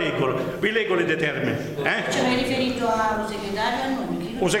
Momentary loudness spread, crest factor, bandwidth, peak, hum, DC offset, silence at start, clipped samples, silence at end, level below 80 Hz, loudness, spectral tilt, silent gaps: 5 LU; 18 dB; 16.5 kHz; -6 dBFS; none; under 0.1%; 0 s; under 0.1%; 0 s; -48 dBFS; -24 LUFS; -4.5 dB/octave; none